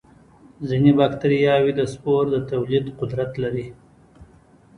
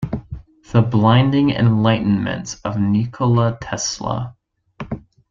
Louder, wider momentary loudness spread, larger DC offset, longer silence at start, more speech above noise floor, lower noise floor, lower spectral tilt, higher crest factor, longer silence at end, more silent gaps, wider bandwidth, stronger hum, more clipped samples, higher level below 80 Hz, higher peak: second, -21 LUFS vs -18 LUFS; second, 11 LU vs 17 LU; neither; first, 0.6 s vs 0 s; first, 32 dB vs 20 dB; first, -52 dBFS vs -36 dBFS; first, -8 dB/octave vs -6 dB/octave; about the same, 18 dB vs 16 dB; first, 0.55 s vs 0.3 s; neither; first, 11 kHz vs 7.6 kHz; neither; neither; second, -52 dBFS vs -44 dBFS; about the same, -4 dBFS vs -2 dBFS